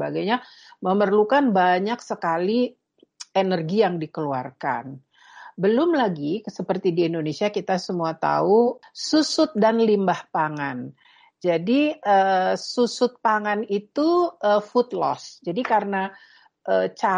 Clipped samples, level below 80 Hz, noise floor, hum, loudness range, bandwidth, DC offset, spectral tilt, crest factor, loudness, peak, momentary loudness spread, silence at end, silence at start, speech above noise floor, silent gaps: under 0.1%; -72 dBFS; -46 dBFS; none; 3 LU; 10 kHz; under 0.1%; -5.5 dB/octave; 16 dB; -22 LUFS; -6 dBFS; 10 LU; 0 s; 0 s; 25 dB; none